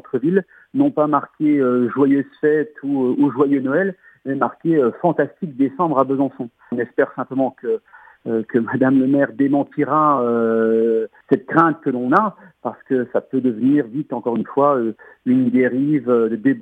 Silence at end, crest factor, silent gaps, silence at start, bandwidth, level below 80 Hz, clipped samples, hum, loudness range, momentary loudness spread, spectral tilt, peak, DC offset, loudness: 0 s; 18 dB; none; 0.15 s; 3.8 kHz; -72 dBFS; under 0.1%; none; 3 LU; 9 LU; -10 dB/octave; 0 dBFS; under 0.1%; -19 LUFS